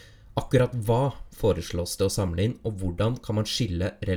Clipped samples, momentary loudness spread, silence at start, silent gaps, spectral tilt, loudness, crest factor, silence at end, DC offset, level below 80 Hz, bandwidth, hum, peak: under 0.1%; 7 LU; 0.15 s; none; -6 dB/octave; -27 LUFS; 18 dB; 0 s; under 0.1%; -42 dBFS; 20 kHz; none; -8 dBFS